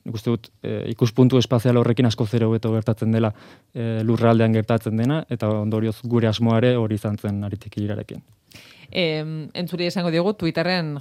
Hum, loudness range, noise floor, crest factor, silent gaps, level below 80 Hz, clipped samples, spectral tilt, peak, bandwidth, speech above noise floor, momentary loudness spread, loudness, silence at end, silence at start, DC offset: none; 5 LU; -47 dBFS; 18 dB; none; -60 dBFS; under 0.1%; -7.5 dB/octave; -2 dBFS; 14 kHz; 26 dB; 11 LU; -22 LUFS; 0 s; 0.05 s; under 0.1%